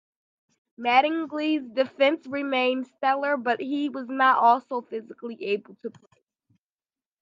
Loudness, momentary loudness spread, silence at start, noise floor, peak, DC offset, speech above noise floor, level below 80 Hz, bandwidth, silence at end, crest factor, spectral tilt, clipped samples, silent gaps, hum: -24 LUFS; 15 LU; 0.8 s; under -90 dBFS; -6 dBFS; under 0.1%; over 65 dB; -84 dBFS; 7.4 kHz; 1.3 s; 20 dB; -5 dB/octave; under 0.1%; none; none